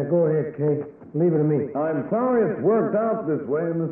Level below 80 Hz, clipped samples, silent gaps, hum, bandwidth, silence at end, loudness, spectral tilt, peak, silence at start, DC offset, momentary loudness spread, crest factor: -66 dBFS; under 0.1%; none; none; 2.9 kHz; 0 s; -23 LUFS; -13.5 dB/octave; -10 dBFS; 0 s; under 0.1%; 5 LU; 12 dB